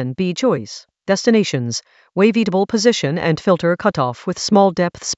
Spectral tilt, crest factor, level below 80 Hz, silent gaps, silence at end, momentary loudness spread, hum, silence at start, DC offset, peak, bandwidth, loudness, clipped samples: -5 dB/octave; 16 dB; -56 dBFS; none; 0.05 s; 10 LU; none; 0 s; under 0.1%; 0 dBFS; 8.2 kHz; -17 LUFS; under 0.1%